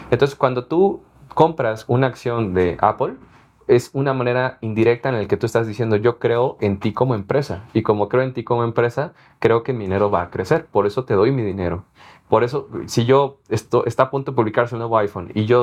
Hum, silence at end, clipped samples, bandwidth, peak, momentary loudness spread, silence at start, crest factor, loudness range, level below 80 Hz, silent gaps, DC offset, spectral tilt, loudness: none; 0 s; under 0.1%; 14.5 kHz; 0 dBFS; 6 LU; 0 s; 20 dB; 1 LU; -52 dBFS; none; under 0.1%; -7 dB/octave; -20 LUFS